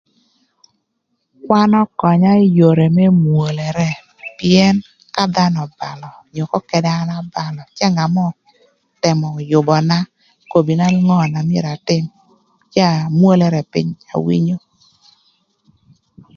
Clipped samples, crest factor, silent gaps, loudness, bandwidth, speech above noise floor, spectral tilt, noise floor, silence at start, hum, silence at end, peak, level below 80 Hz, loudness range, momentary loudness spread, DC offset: under 0.1%; 16 dB; none; -15 LUFS; 7.2 kHz; 56 dB; -7 dB/octave; -70 dBFS; 1.45 s; none; 1.8 s; 0 dBFS; -54 dBFS; 5 LU; 13 LU; under 0.1%